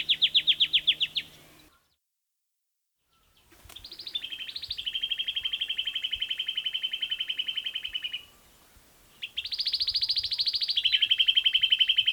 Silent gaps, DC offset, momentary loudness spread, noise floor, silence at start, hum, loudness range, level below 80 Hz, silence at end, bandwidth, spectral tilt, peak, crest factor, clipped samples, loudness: none; under 0.1%; 14 LU; -82 dBFS; 0 s; none; 13 LU; -64 dBFS; 0 s; over 20 kHz; 1 dB/octave; -10 dBFS; 20 dB; under 0.1%; -26 LUFS